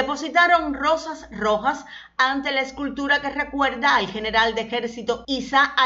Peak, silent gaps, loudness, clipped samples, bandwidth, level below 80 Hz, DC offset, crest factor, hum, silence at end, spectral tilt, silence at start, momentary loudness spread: -6 dBFS; none; -21 LUFS; under 0.1%; 8 kHz; -50 dBFS; under 0.1%; 16 dB; none; 0 s; -3 dB/octave; 0 s; 9 LU